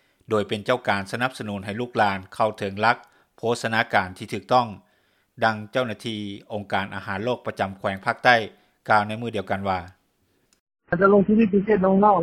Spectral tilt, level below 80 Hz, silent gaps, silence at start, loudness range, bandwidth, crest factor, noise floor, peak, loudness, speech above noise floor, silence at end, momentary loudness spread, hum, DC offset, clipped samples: -6 dB/octave; -58 dBFS; 10.60-10.67 s; 0.3 s; 4 LU; 14 kHz; 22 dB; -67 dBFS; -2 dBFS; -23 LUFS; 45 dB; 0 s; 13 LU; none; under 0.1%; under 0.1%